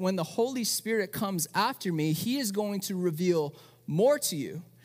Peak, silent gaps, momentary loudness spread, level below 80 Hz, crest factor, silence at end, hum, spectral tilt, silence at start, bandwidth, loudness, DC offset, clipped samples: -14 dBFS; none; 7 LU; -74 dBFS; 16 dB; 0.2 s; none; -4.5 dB/octave; 0 s; 16 kHz; -29 LUFS; under 0.1%; under 0.1%